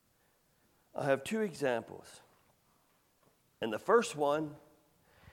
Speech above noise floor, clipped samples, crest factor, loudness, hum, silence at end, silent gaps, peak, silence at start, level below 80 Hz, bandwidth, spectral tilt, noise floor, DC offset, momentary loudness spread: 39 dB; under 0.1%; 22 dB; -34 LUFS; none; 0.75 s; none; -14 dBFS; 0.95 s; -76 dBFS; 16.5 kHz; -5 dB/octave; -72 dBFS; under 0.1%; 16 LU